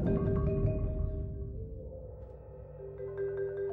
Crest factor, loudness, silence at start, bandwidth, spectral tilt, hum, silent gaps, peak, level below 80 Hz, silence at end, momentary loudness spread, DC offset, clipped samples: 16 dB; -36 LUFS; 0 s; 3.9 kHz; -12.5 dB/octave; none; none; -18 dBFS; -40 dBFS; 0 s; 18 LU; under 0.1%; under 0.1%